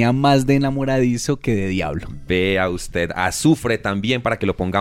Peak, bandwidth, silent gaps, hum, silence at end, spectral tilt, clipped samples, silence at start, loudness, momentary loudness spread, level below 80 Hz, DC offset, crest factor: -4 dBFS; 16 kHz; none; none; 0 s; -5.5 dB/octave; under 0.1%; 0 s; -19 LUFS; 7 LU; -38 dBFS; under 0.1%; 16 dB